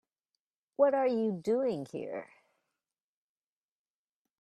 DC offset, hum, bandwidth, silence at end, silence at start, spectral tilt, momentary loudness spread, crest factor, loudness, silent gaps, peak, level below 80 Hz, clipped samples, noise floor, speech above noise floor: under 0.1%; none; 10.5 kHz; 2.15 s; 0.8 s; -7.5 dB/octave; 15 LU; 22 dB; -31 LUFS; none; -14 dBFS; -82 dBFS; under 0.1%; under -90 dBFS; over 60 dB